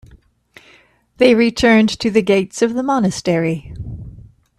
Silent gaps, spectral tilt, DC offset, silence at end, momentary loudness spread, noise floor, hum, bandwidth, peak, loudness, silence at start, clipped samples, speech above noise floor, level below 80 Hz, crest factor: none; -5.5 dB/octave; under 0.1%; 0.4 s; 19 LU; -51 dBFS; none; 12.5 kHz; 0 dBFS; -15 LUFS; 1.2 s; under 0.1%; 36 dB; -44 dBFS; 16 dB